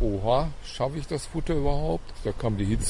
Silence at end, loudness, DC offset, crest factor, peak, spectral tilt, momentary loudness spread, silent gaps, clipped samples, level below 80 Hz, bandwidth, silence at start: 0 s; -29 LUFS; under 0.1%; 16 dB; -10 dBFS; -6 dB/octave; 7 LU; none; under 0.1%; -34 dBFS; 11.5 kHz; 0 s